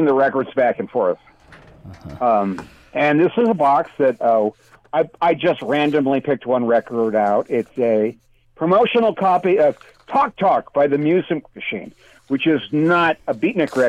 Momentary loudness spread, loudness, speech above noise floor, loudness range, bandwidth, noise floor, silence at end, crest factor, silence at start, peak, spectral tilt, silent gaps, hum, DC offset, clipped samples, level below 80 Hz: 9 LU; -18 LUFS; 27 dB; 2 LU; 10.5 kHz; -45 dBFS; 0 s; 12 dB; 0 s; -6 dBFS; -7.5 dB/octave; none; none; under 0.1%; under 0.1%; -58 dBFS